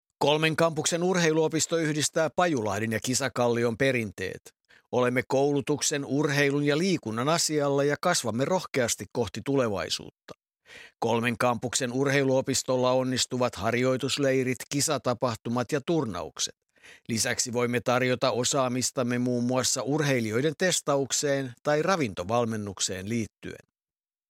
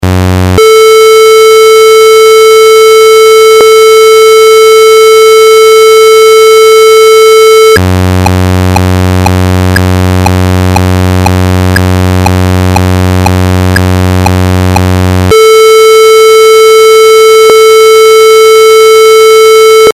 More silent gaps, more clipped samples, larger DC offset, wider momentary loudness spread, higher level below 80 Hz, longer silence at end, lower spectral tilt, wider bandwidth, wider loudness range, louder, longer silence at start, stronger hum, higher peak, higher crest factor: neither; second, under 0.1% vs 9%; neither; about the same, 7 LU vs 6 LU; second, -64 dBFS vs -28 dBFS; first, 0.75 s vs 0 s; about the same, -4 dB/octave vs -4.5 dB/octave; about the same, 16.5 kHz vs 16 kHz; second, 3 LU vs 6 LU; second, -26 LUFS vs -2 LUFS; first, 0.2 s vs 0 s; neither; second, -8 dBFS vs 0 dBFS; first, 20 dB vs 2 dB